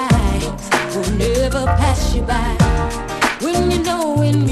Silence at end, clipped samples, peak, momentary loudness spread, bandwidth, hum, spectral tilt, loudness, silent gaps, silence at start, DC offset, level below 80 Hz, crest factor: 0 s; under 0.1%; 0 dBFS; 4 LU; 13 kHz; none; -5.5 dB/octave; -17 LUFS; none; 0 s; under 0.1%; -22 dBFS; 16 dB